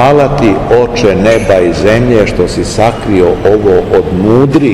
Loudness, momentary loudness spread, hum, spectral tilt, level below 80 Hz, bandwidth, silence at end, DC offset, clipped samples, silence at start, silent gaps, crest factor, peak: -8 LUFS; 3 LU; none; -6.5 dB/octave; -26 dBFS; 12.5 kHz; 0 s; 1%; 5%; 0 s; none; 8 dB; 0 dBFS